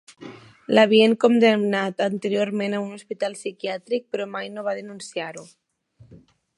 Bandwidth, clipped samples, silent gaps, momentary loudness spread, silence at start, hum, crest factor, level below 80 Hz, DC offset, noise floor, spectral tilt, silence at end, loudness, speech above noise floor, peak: 11.5 kHz; under 0.1%; none; 18 LU; 0.2 s; none; 20 dB; -72 dBFS; under 0.1%; -55 dBFS; -5 dB/octave; 0.4 s; -22 LUFS; 33 dB; -2 dBFS